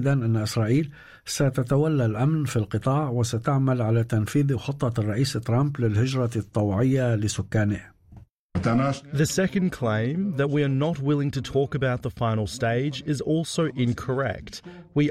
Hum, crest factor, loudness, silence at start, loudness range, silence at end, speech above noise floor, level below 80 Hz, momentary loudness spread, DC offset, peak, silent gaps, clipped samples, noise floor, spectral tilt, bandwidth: none; 12 dB; -25 LUFS; 0 s; 2 LU; 0 s; 26 dB; -52 dBFS; 5 LU; under 0.1%; -12 dBFS; 8.31-8.50 s; under 0.1%; -50 dBFS; -6.5 dB/octave; 14.5 kHz